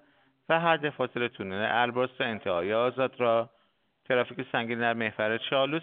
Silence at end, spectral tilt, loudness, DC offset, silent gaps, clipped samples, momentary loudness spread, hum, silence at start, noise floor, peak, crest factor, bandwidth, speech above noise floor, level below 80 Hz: 0 s; -2.5 dB/octave; -28 LUFS; under 0.1%; none; under 0.1%; 5 LU; none; 0.5 s; -70 dBFS; -8 dBFS; 20 dB; 4.6 kHz; 42 dB; -74 dBFS